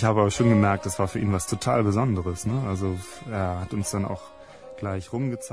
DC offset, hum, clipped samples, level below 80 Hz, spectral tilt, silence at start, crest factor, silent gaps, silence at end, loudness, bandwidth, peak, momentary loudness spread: 0.2%; none; under 0.1%; -48 dBFS; -6 dB/octave; 0 s; 18 dB; none; 0 s; -25 LUFS; 11 kHz; -8 dBFS; 14 LU